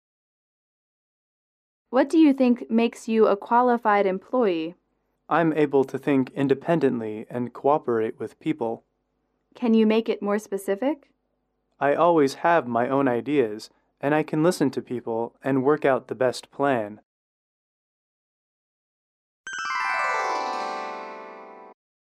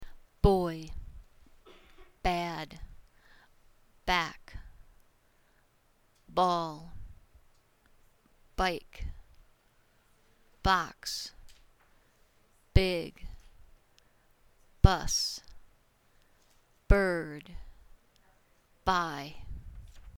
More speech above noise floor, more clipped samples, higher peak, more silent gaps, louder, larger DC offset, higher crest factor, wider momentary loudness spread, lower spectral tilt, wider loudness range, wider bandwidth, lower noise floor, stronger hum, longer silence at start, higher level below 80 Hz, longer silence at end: first, 52 dB vs 37 dB; neither; second, -8 dBFS vs -2 dBFS; first, 17.05-19.44 s vs none; first, -23 LUFS vs -31 LUFS; neither; second, 18 dB vs 30 dB; second, 12 LU vs 25 LU; first, -6.5 dB/octave vs -5 dB/octave; about the same, 8 LU vs 7 LU; second, 13.5 kHz vs 18 kHz; first, -74 dBFS vs -68 dBFS; neither; first, 1.9 s vs 0 s; second, -74 dBFS vs -40 dBFS; first, 0.4 s vs 0.1 s